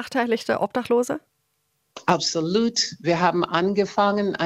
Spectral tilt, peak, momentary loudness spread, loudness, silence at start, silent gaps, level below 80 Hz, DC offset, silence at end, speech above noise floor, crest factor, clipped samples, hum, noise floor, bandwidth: -4 dB/octave; -2 dBFS; 4 LU; -22 LUFS; 0 s; none; -62 dBFS; under 0.1%; 0 s; 50 dB; 20 dB; under 0.1%; none; -72 dBFS; 15.5 kHz